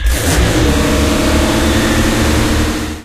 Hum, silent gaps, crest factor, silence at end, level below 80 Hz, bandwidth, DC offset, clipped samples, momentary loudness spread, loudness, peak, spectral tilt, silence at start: none; none; 12 dB; 0 s; -18 dBFS; 15.5 kHz; 1%; under 0.1%; 2 LU; -13 LUFS; 0 dBFS; -4.5 dB/octave; 0 s